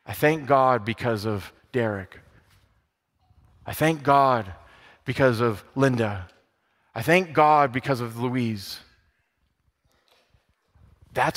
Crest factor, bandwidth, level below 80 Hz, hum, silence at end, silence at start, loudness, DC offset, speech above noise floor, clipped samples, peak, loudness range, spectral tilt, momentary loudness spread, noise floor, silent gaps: 20 dB; 16 kHz; -58 dBFS; none; 0 s; 0.05 s; -23 LUFS; under 0.1%; 49 dB; under 0.1%; -4 dBFS; 7 LU; -6 dB/octave; 18 LU; -71 dBFS; none